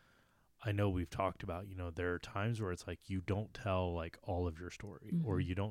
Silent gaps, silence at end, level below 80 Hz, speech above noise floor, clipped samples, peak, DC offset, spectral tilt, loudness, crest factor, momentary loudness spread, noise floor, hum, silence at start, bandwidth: none; 0 s; -56 dBFS; 32 dB; under 0.1%; -22 dBFS; under 0.1%; -7 dB/octave; -40 LUFS; 16 dB; 9 LU; -71 dBFS; none; 0.6 s; 13 kHz